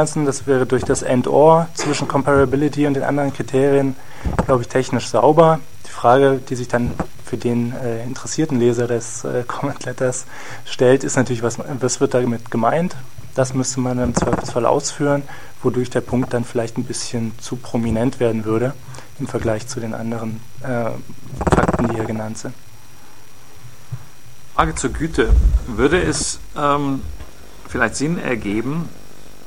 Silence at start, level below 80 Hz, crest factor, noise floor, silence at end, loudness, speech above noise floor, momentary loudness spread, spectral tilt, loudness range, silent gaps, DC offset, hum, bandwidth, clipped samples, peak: 0 s; -30 dBFS; 18 dB; -44 dBFS; 0 s; -19 LUFS; 26 dB; 12 LU; -5.5 dB/octave; 6 LU; none; 3%; none; 16.5 kHz; under 0.1%; 0 dBFS